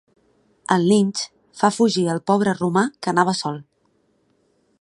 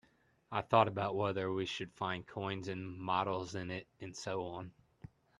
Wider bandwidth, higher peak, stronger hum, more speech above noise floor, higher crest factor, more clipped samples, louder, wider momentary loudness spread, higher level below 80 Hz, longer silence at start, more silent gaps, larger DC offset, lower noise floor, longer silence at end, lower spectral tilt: about the same, 11.5 kHz vs 11 kHz; first, -2 dBFS vs -14 dBFS; neither; first, 46 dB vs 30 dB; about the same, 20 dB vs 24 dB; neither; first, -20 LUFS vs -37 LUFS; about the same, 12 LU vs 14 LU; about the same, -66 dBFS vs -70 dBFS; first, 0.7 s vs 0.5 s; neither; neither; about the same, -65 dBFS vs -67 dBFS; first, 1.2 s vs 0.7 s; about the same, -5 dB/octave vs -5.5 dB/octave